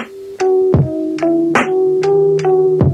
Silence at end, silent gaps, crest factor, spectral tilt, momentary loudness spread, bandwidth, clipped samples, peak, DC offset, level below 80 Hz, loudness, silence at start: 0 s; none; 12 dB; -7.5 dB/octave; 5 LU; 9.4 kHz; under 0.1%; -2 dBFS; under 0.1%; -40 dBFS; -14 LUFS; 0 s